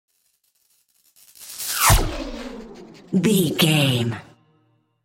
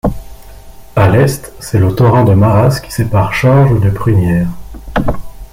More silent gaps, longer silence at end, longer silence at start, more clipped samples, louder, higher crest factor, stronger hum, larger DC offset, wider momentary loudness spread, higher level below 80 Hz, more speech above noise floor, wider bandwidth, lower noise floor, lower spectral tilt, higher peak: neither; first, 0.8 s vs 0.1 s; first, 1.4 s vs 0.05 s; neither; second, -20 LUFS vs -11 LUFS; first, 20 dB vs 10 dB; neither; neither; first, 21 LU vs 12 LU; second, -34 dBFS vs -28 dBFS; first, 48 dB vs 22 dB; about the same, 17 kHz vs 16 kHz; first, -67 dBFS vs -32 dBFS; second, -4 dB/octave vs -7.5 dB/octave; about the same, -2 dBFS vs 0 dBFS